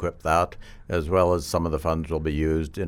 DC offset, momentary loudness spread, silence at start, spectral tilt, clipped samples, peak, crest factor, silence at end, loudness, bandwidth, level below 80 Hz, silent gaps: under 0.1%; 7 LU; 0 s; -6.5 dB/octave; under 0.1%; -8 dBFS; 16 dB; 0 s; -25 LUFS; 17 kHz; -36 dBFS; none